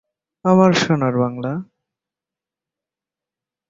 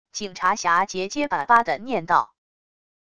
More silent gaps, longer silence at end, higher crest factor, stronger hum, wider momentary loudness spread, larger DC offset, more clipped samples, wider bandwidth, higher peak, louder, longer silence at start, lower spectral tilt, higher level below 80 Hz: neither; first, 2.05 s vs 0.8 s; about the same, 18 dB vs 20 dB; neither; first, 13 LU vs 8 LU; second, under 0.1% vs 0.5%; neither; second, 7.6 kHz vs 11 kHz; about the same, -2 dBFS vs -2 dBFS; first, -17 LUFS vs -22 LUFS; first, 0.45 s vs 0.15 s; first, -6.5 dB/octave vs -3 dB/octave; about the same, -60 dBFS vs -60 dBFS